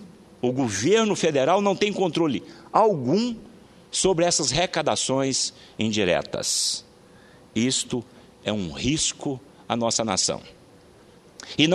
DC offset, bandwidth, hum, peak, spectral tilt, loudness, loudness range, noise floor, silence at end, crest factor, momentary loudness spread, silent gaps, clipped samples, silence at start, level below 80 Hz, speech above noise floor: under 0.1%; 13 kHz; none; -2 dBFS; -3.5 dB/octave; -23 LUFS; 4 LU; -51 dBFS; 0 s; 22 dB; 12 LU; none; under 0.1%; 0 s; -54 dBFS; 28 dB